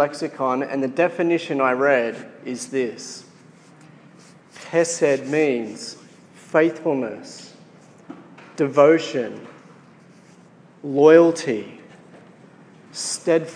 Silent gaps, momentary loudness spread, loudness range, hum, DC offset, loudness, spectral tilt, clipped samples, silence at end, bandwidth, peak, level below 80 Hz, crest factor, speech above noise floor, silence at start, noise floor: none; 23 LU; 6 LU; none; under 0.1%; -20 LUFS; -4.5 dB/octave; under 0.1%; 0 s; 10.5 kHz; -2 dBFS; -82 dBFS; 20 dB; 30 dB; 0 s; -49 dBFS